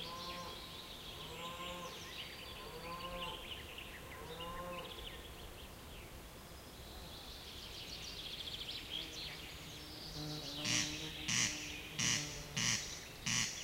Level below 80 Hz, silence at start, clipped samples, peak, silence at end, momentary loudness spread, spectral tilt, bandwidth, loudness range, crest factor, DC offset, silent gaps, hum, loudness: -58 dBFS; 0 s; under 0.1%; -18 dBFS; 0 s; 16 LU; -1.5 dB/octave; 16 kHz; 12 LU; 26 dB; under 0.1%; none; none; -42 LUFS